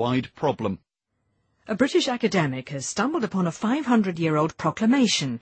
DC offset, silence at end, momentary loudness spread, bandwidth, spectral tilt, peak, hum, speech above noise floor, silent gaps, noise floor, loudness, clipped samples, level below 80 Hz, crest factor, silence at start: under 0.1%; 0.05 s; 9 LU; 8.8 kHz; -5 dB/octave; -8 dBFS; none; 51 dB; none; -75 dBFS; -24 LUFS; under 0.1%; -62 dBFS; 16 dB; 0 s